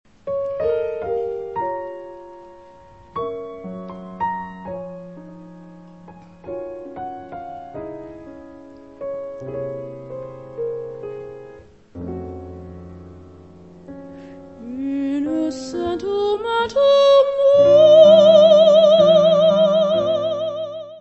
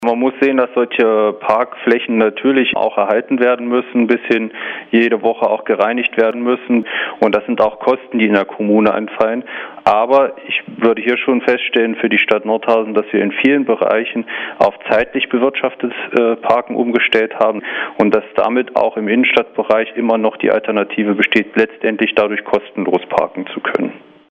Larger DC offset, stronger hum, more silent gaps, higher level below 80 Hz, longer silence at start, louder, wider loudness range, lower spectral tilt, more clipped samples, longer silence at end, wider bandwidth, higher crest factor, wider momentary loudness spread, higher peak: first, 0.2% vs under 0.1%; neither; neither; about the same, -54 dBFS vs -58 dBFS; first, 0.25 s vs 0 s; about the same, -16 LUFS vs -15 LUFS; first, 23 LU vs 1 LU; about the same, -6 dB/octave vs -6.5 dB/octave; neither; second, 0 s vs 0.3 s; first, 8.2 kHz vs 7.2 kHz; about the same, 18 dB vs 14 dB; first, 25 LU vs 5 LU; about the same, 0 dBFS vs 0 dBFS